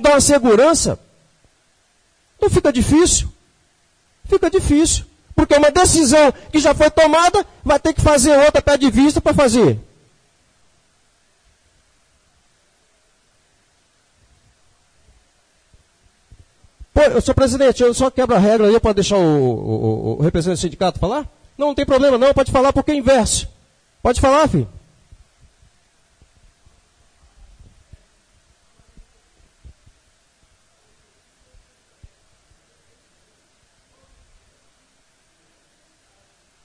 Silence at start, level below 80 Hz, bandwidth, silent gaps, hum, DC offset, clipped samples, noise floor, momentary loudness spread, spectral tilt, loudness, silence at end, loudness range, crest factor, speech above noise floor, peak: 0 s; -34 dBFS; 11 kHz; none; none; under 0.1%; under 0.1%; -59 dBFS; 10 LU; -4.5 dB/octave; -15 LUFS; 12 s; 8 LU; 16 dB; 46 dB; -2 dBFS